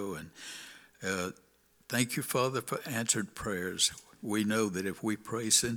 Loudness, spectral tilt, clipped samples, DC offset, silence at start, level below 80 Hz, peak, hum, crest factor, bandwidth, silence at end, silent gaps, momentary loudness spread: -32 LUFS; -3 dB/octave; under 0.1%; under 0.1%; 0 s; -64 dBFS; -10 dBFS; none; 24 dB; over 20 kHz; 0 s; none; 15 LU